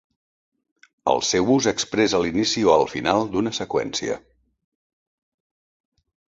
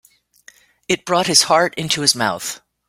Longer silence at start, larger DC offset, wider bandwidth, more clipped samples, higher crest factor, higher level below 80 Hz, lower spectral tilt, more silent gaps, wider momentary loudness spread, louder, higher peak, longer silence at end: first, 1.05 s vs 0.9 s; neither; second, 8 kHz vs 16.5 kHz; neither; about the same, 22 dB vs 20 dB; about the same, -54 dBFS vs -58 dBFS; first, -3.5 dB/octave vs -2 dB/octave; neither; about the same, 9 LU vs 11 LU; second, -21 LUFS vs -16 LUFS; about the same, -2 dBFS vs 0 dBFS; first, 2.15 s vs 0.3 s